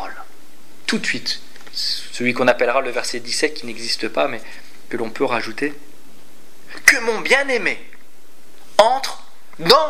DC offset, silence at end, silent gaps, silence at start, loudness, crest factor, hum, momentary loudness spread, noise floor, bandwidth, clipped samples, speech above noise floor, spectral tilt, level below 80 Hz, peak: 5%; 0 s; none; 0 s; -19 LUFS; 22 dB; none; 16 LU; -51 dBFS; 16 kHz; under 0.1%; 31 dB; -2 dB/octave; -60 dBFS; 0 dBFS